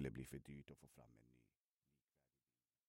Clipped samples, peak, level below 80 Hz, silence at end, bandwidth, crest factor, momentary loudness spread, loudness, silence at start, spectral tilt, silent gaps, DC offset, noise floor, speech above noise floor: under 0.1%; -34 dBFS; -72 dBFS; 1.45 s; 16 kHz; 24 dB; 16 LU; -56 LUFS; 0 s; -6.5 dB/octave; none; under 0.1%; under -90 dBFS; over 32 dB